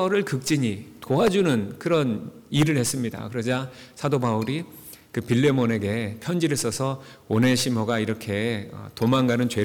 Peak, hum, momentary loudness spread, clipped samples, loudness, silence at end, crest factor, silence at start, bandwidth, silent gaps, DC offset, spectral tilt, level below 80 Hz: -10 dBFS; none; 11 LU; under 0.1%; -24 LUFS; 0 s; 14 dB; 0 s; 19.5 kHz; none; under 0.1%; -5.5 dB/octave; -58 dBFS